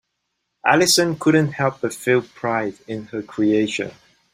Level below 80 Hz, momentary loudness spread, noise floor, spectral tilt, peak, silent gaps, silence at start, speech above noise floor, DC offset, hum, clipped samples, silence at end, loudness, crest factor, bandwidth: -60 dBFS; 14 LU; -75 dBFS; -4 dB/octave; -2 dBFS; none; 0.65 s; 56 dB; under 0.1%; none; under 0.1%; 0.4 s; -20 LUFS; 20 dB; 16 kHz